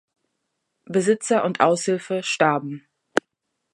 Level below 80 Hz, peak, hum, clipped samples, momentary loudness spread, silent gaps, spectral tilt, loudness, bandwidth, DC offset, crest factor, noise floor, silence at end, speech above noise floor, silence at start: -72 dBFS; 0 dBFS; none; under 0.1%; 8 LU; none; -4.5 dB/octave; -22 LUFS; 11.5 kHz; under 0.1%; 22 dB; -77 dBFS; 0.55 s; 56 dB; 0.9 s